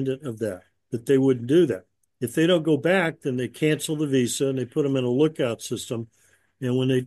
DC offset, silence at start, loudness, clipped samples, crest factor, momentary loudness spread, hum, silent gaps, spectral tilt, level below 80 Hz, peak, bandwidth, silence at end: under 0.1%; 0 s; -24 LUFS; under 0.1%; 16 dB; 12 LU; none; none; -5.5 dB/octave; -68 dBFS; -8 dBFS; 12.5 kHz; 0 s